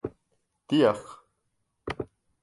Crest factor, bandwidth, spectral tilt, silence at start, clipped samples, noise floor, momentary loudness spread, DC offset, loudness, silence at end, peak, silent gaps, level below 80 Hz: 22 dB; 11.5 kHz; -6.5 dB/octave; 0.05 s; under 0.1%; -77 dBFS; 19 LU; under 0.1%; -27 LUFS; 0.4 s; -10 dBFS; none; -58 dBFS